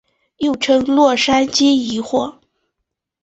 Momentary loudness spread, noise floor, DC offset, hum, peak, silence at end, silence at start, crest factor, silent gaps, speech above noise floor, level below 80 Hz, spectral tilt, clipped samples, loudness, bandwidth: 8 LU; -77 dBFS; under 0.1%; none; -2 dBFS; 0.9 s; 0.4 s; 14 dB; none; 63 dB; -54 dBFS; -3 dB/octave; under 0.1%; -15 LUFS; 8.2 kHz